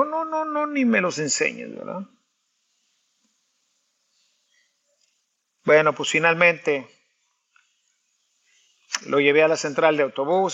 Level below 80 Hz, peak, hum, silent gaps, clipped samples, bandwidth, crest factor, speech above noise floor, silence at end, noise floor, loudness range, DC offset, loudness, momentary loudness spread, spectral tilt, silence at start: -80 dBFS; -2 dBFS; none; none; under 0.1%; 8.4 kHz; 22 dB; 52 dB; 0 s; -73 dBFS; 10 LU; under 0.1%; -21 LUFS; 16 LU; -3.5 dB/octave; 0 s